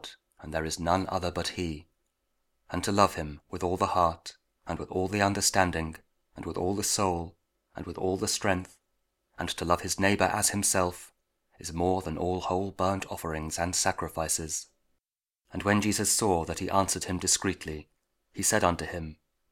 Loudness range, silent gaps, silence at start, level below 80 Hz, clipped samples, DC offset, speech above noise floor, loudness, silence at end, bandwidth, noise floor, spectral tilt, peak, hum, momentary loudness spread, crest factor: 3 LU; none; 0.05 s; -52 dBFS; under 0.1%; under 0.1%; 58 dB; -28 LUFS; 0.4 s; 19.5 kHz; -87 dBFS; -3.5 dB/octave; -6 dBFS; none; 16 LU; 24 dB